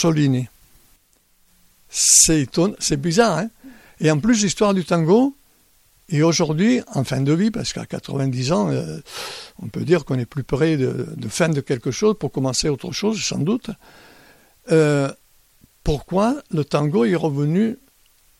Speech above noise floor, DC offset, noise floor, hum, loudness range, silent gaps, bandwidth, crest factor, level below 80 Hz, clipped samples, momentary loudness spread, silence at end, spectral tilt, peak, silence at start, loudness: 40 dB; under 0.1%; -59 dBFS; none; 5 LU; none; 15 kHz; 20 dB; -44 dBFS; under 0.1%; 11 LU; 0.65 s; -4.5 dB/octave; 0 dBFS; 0 s; -19 LUFS